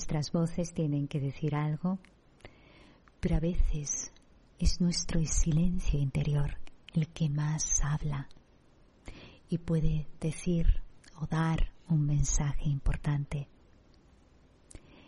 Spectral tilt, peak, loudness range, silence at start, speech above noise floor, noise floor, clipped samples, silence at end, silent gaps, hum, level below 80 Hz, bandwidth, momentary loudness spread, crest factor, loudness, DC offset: -5.5 dB/octave; -12 dBFS; 4 LU; 0 s; 32 dB; -61 dBFS; under 0.1%; 1.65 s; none; none; -36 dBFS; 11 kHz; 11 LU; 18 dB; -32 LUFS; under 0.1%